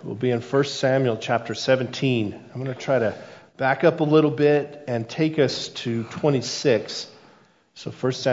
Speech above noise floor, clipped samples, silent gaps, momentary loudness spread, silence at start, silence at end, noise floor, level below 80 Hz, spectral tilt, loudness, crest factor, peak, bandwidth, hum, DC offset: 33 dB; under 0.1%; none; 13 LU; 0 s; 0 s; -56 dBFS; -68 dBFS; -5.5 dB/octave; -23 LUFS; 18 dB; -4 dBFS; 7.8 kHz; none; under 0.1%